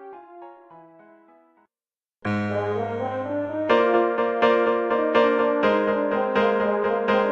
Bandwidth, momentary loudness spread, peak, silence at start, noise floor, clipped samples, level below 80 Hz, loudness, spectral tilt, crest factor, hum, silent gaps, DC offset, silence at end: 7 kHz; 8 LU; -6 dBFS; 0 s; under -90 dBFS; under 0.1%; -58 dBFS; -22 LUFS; -7 dB/octave; 16 dB; none; none; under 0.1%; 0 s